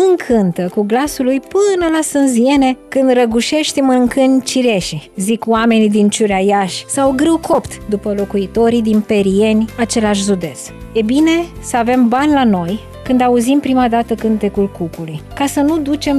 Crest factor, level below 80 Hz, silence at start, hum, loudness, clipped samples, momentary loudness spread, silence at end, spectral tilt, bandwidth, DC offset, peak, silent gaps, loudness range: 10 dB; -40 dBFS; 0 s; none; -14 LUFS; under 0.1%; 7 LU; 0 s; -5 dB/octave; 14.5 kHz; under 0.1%; -2 dBFS; none; 2 LU